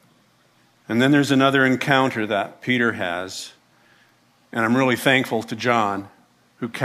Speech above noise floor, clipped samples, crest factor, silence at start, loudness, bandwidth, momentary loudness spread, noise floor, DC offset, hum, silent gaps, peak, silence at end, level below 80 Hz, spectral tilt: 39 dB; under 0.1%; 20 dB; 0.9 s; -20 LUFS; 15.5 kHz; 15 LU; -59 dBFS; under 0.1%; 60 Hz at -50 dBFS; none; -2 dBFS; 0 s; -68 dBFS; -5 dB/octave